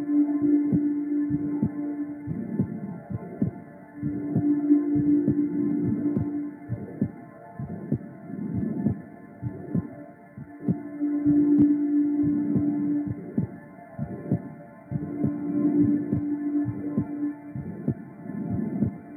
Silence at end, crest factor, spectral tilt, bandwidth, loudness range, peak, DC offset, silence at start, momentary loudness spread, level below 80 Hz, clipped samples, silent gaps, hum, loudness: 0 s; 18 dB; -13 dB/octave; 2.3 kHz; 8 LU; -10 dBFS; under 0.1%; 0 s; 15 LU; -56 dBFS; under 0.1%; none; none; -27 LUFS